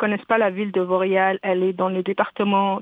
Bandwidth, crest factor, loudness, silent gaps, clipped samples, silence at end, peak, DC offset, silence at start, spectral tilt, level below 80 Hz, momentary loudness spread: 4 kHz; 16 dB; -21 LUFS; none; under 0.1%; 0 s; -4 dBFS; under 0.1%; 0 s; -9 dB/octave; -70 dBFS; 4 LU